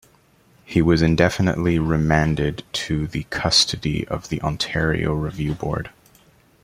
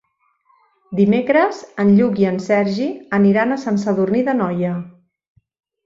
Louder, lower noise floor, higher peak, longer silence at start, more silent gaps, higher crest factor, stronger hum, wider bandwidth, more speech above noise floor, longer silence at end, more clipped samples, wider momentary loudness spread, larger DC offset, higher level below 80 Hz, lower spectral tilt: second, -21 LUFS vs -17 LUFS; second, -56 dBFS vs -62 dBFS; about the same, -2 dBFS vs -2 dBFS; second, 0.7 s vs 0.9 s; neither; about the same, 20 dB vs 16 dB; neither; first, 15 kHz vs 7.4 kHz; second, 36 dB vs 46 dB; second, 0.75 s vs 0.95 s; neither; about the same, 10 LU vs 9 LU; neither; first, -38 dBFS vs -60 dBFS; second, -5 dB/octave vs -8 dB/octave